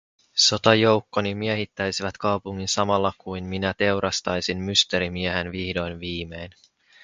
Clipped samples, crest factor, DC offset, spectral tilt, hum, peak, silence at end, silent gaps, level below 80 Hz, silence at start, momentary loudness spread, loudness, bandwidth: under 0.1%; 24 dB; under 0.1%; -3.5 dB/octave; none; 0 dBFS; 0.55 s; none; -46 dBFS; 0.35 s; 13 LU; -23 LUFS; 9.6 kHz